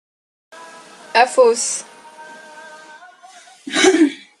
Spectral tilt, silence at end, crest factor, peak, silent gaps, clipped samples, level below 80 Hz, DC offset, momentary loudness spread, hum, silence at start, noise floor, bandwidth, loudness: -1 dB/octave; 0.25 s; 20 dB; 0 dBFS; none; under 0.1%; -66 dBFS; under 0.1%; 26 LU; none; 0.6 s; -44 dBFS; 12.5 kHz; -16 LUFS